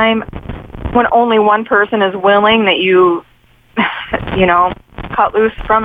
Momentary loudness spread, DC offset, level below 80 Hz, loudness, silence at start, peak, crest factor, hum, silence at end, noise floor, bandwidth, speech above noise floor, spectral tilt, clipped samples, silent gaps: 13 LU; under 0.1%; -34 dBFS; -12 LUFS; 0 s; 0 dBFS; 12 dB; none; 0 s; -47 dBFS; 4.7 kHz; 35 dB; -7.5 dB/octave; under 0.1%; none